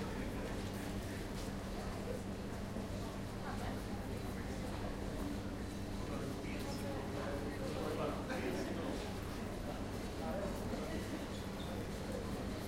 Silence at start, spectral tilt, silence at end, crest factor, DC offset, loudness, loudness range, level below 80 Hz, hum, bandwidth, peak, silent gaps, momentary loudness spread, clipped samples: 0 s; -5.5 dB/octave; 0 s; 14 dB; under 0.1%; -43 LUFS; 2 LU; -50 dBFS; none; 16 kHz; -28 dBFS; none; 4 LU; under 0.1%